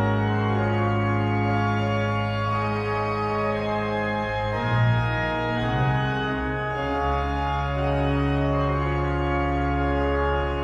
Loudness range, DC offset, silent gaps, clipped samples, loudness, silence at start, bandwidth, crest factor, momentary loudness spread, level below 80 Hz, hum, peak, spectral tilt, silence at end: 1 LU; under 0.1%; none; under 0.1%; -24 LUFS; 0 s; 7.2 kHz; 12 dB; 3 LU; -34 dBFS; none; -10 dBFS; -8 dB/octave; 0 s